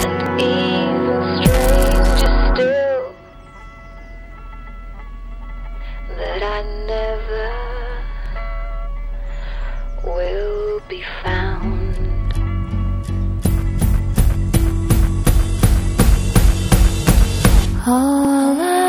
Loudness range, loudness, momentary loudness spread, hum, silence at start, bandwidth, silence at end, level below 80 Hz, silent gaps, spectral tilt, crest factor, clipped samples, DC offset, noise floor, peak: 12 LU; -18 LUFS; 19 LU; none; 0 s; 17.5 kHz; 0 s; -20 dBFS; none; -5.5 dB/octave; 16 dB; under 0.1%; under 0.1%; -39 dBFS; 0 dBFS